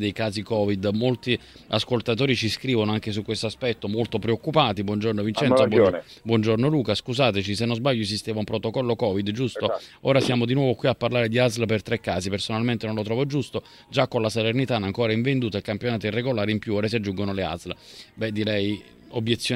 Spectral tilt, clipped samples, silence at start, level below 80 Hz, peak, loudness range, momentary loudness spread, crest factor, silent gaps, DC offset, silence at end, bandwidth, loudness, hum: -6 dB/octave; under 0.1%; 0 s; -56 dBFS; -4 dBFS; 4 LU; 7 LU; 20 dB; none; under 0.1%; 0 s; 15.5 kHz; -24 LUFS; none